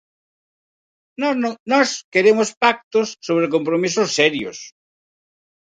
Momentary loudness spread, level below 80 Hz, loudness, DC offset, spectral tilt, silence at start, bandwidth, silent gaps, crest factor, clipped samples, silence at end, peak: 8 LU; -68 dBFS; -18 LUFS; under 0.1%; -3.5 dB/octave; 1.2 s; 9.4 kHz; 1.60-1.66 s, 2.04-2.12 s, 2.57-2.61 s, 2.84-2.91 s; 20 dB; under 0.1%; 0.9 s; 0 dBFS